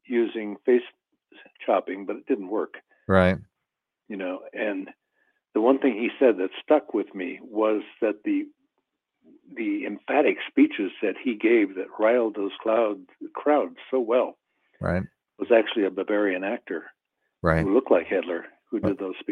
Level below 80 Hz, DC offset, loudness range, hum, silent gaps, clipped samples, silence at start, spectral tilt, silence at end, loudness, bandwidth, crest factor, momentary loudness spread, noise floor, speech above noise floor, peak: -54 dBFS; under 0.1%; 4 LU; none; none; under 0.1%; 0.1 s; -8.5 dB/octave; 0 s; -25 LUFS; 9.4 kHz; 22 dB; 13 LU; -84 dBFS; 59 dB; -4 dBFS